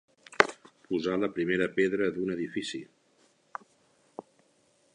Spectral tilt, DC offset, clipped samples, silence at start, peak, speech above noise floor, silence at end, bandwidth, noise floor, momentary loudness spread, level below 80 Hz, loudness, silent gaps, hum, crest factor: -5 dB/octave; under 0.1%; under 0.1%; 0.3 s; 0 dBFS; 38 dB; 0.75 s; 10.5 kHz; -67 dBFS; 22 LU; -68 dBFS; -29 LUFS; none; none; 32 dB